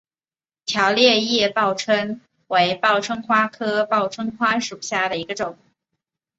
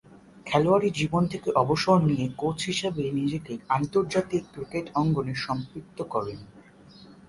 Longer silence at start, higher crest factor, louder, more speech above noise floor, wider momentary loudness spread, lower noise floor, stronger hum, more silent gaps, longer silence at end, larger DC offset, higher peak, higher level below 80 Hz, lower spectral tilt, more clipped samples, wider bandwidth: first, 0.65 s vs 0.35 s; about the same, 18 dB vs 18 dB; first, -20 LUFS vs -26 LUFS; first, over 70 dB vs 25 dB; about the same, 12 LU vs 12 LU; first, under -90 dBFS vs -51 dBFS; neither; neither; first, 0.85 s vs 0.15 s; neither; first, -2 dBFS vs -8 dBFS; second, -64 dBFS vs -56 dBFS; second, -3 dB/octave vs -6 dB/octave; neither; second, 8 kHz vs 11.5 kHz